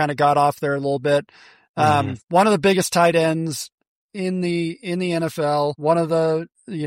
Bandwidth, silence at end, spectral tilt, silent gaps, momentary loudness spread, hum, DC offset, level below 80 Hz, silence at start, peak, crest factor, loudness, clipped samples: 16 kHz; 0 s; -5.5 dB/octave; 1.69-1.74 s, 3.74-3.78 s, 3.87-4.09 s; 10 LU; none; under 0.1%; -60 dBFS; 0 s; -4 dBFS; 16 dB; -20 LUFS; under 0.1%